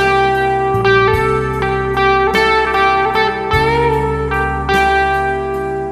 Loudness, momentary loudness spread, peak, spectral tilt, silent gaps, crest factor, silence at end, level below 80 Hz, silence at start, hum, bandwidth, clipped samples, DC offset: -14 LUFS; 5 LU; 0 dBFS; -5.5 dB/octave; none; 14 dB; 0 s; -28 dBFS; 0 s; none; 15 kHz; under 0.1%; under 0.1%